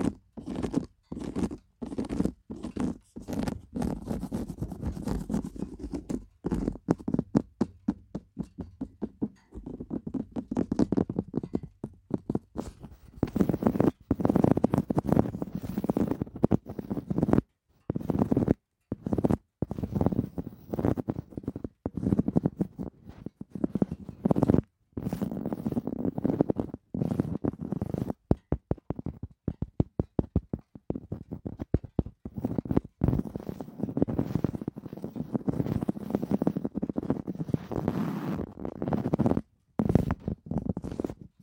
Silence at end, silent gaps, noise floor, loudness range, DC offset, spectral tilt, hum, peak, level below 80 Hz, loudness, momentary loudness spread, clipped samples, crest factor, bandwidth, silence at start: 0.15 s; none; -48 dBFS; 6 LU; under 0.1%; -9 dB/octave; none; -6 dBFS; -46 dBFS; -31 LUFS; 13 LU; under 0.1%; 24 dB; 16.5 kHz; 0 s